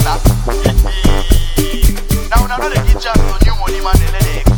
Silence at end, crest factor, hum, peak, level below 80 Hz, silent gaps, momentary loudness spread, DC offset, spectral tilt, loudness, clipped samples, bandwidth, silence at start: 0 s; 10 dB; none; 0 dBFS; -12 dBFS; none; 2 LU; under 0.1%; -5 dB/octave; -14 LUFS; under 0.1%; over 20 kHz; 0 s